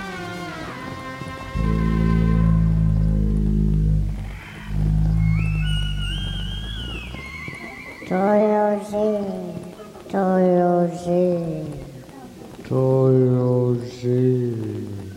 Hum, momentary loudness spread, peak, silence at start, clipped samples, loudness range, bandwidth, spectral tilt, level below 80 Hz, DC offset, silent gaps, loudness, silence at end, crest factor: none; 16 LU; -6 dBFS; 0 s; under 0.1%; 4 LU; 11 kHz; -8 dB/octave; -28 dBFS; under 0.1%; none; -22 LUFS; 0 s; 14 dB